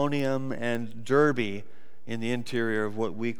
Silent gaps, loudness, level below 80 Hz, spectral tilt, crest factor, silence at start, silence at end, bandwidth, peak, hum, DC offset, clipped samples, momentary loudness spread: none; -28 LUFS; -72 dBFS; -6.5 dB/octave; 18 dB; 0 s; 0.05 s; 19.5 kHz; -10 dBFS; none; 2%; under 0.1%; 10 LU